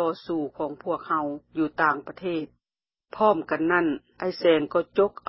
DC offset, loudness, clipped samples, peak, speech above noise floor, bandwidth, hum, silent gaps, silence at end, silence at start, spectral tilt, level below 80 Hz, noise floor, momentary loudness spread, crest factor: under 0.1%; -26 LUFS; under 0.1%; -8 dBFS; over 65 dB; 5.8 kHz; none; none; 0.2 s; 0 s; -9.5 dB/octave; -64 dBFS; under -90 dBFS; 10 LU; 18 dB